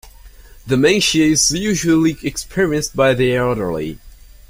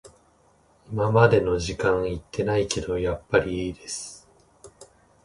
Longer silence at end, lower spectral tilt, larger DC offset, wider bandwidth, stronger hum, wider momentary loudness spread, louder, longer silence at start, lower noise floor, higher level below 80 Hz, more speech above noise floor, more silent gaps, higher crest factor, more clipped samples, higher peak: about the same, 0.4 s vs 0.4 s; second, -4 dB/octave vs -5.5 dB/octave; neither; first, 16 kHz vs 11.5 kHz; neither; second, 10 LU vs 15 LU; first, -16 LUFS vs -24 LUFS; second, 0.05 s vs 0.9 s; second, -40 dBFS vs -60 dBFS; first, -38 dBFS vs -44 dBFS; second, 25 dB vs 37 dB; neither; second, 16 dB vs 24 dB; neither; about the same, -2 dBFS vs -2 dBFS